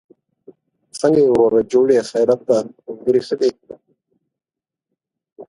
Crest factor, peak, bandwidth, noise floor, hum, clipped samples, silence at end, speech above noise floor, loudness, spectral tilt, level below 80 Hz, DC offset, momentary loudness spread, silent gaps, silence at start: 16 dB; -2 dBFS; 11.5 kHz; -88 dBFS; none; under 0.1%; 0.05 s; 72 dB; -17 LUFS; -6 dB/octave; -58 dBFS; under 0.1%; 8 LU; 5.32-5.36 s; 0.95 s